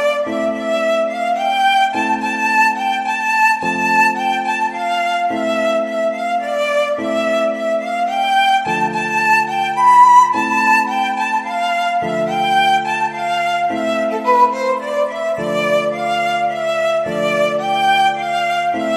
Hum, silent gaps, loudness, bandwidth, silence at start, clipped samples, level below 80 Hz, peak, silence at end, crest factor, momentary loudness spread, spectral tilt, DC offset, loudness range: none; none; -16 LUFS; 15 kHz; 0 s; under 0.1%; -60 dBFS; 0 dBFS; 0 s; 16 dB; 5 LU; -3.5 dB/octave; under 0.1%; 4 LU